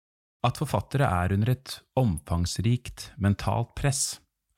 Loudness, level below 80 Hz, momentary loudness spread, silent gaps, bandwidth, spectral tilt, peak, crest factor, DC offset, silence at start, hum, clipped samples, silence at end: -27 LUFS; -44 dBFS; 5 LU; none; 16.5 kHz; -5.5 dB/octave; -12 dBFS; 16 dB; under 0.1%; 0.45 s; none; under 0.1%; 0.4 s